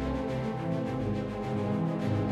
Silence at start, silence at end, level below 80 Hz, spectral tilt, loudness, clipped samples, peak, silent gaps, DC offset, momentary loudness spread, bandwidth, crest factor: 0 s; 0 s; -46 dBFS; -8.5 dB/octave; -32 LUFS; under 0.1%; -20 dBFS; none; under 0.1%; 3 LU; 11.5 kHz; 12 dB